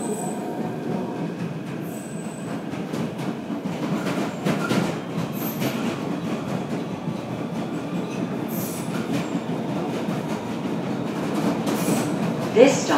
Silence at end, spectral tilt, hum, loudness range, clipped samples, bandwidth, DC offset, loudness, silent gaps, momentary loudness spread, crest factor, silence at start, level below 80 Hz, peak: 0 s; -5.5 dB/octave; none; 4 LU; under 0.1%; 16 kHz; under 0.1%; -26 LUFS; none; 7 LU; 24 dB; 0 s; -64 dBFS; 0 dBFS